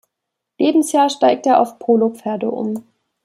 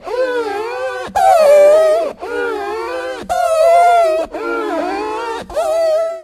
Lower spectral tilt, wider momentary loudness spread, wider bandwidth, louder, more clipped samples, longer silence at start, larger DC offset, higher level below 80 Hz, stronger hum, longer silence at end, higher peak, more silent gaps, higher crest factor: first, -4.5 dB/octave vs -3 dB/octave; second, 9 LU vs 13 LU; about the same, 15 kHz vs 15.5 kHz; second, -17 LUFS vs -14 LUFS; neither; first, 0.6 s vs 0 s; neither; second, -70 dBFS vs -48 dBFS; neither; first, 0.45 s vs 0 s; about the same, -2 dBFS vs 0 dBFS; neither; about the same, 16 dB vs 14 dB